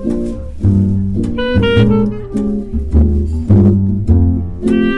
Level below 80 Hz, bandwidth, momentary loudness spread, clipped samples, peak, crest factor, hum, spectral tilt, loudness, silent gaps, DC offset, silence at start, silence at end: -22 dBFS; 5.6 kHz; 8 LU; under 0.1%; -2 dBFS; 10 dB; none; -9 dB/octave; -14 LUFS; none; under 0.1%; 0 s; 0 s